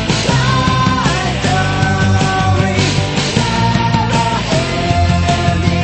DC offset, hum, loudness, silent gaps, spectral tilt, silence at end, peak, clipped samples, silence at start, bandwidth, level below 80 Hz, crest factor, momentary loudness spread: under 0.1%; none; -14 LUFS; none; -5 dB/octave; 0 s; 0 dBFS; under 0.1%; 0 s; 8.8 kHz; -28 dBFS; 14 dB; 2 LU